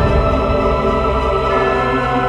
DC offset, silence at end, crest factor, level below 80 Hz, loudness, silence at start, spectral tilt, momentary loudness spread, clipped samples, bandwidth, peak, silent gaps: under 0.1%; 0 s; 12 dB; -22 dBFS; -15 LUFS; 0 s; -7.5 dB/octave; 1 LU; under 0.1%; 9.8 kHz; -2 dBFS; none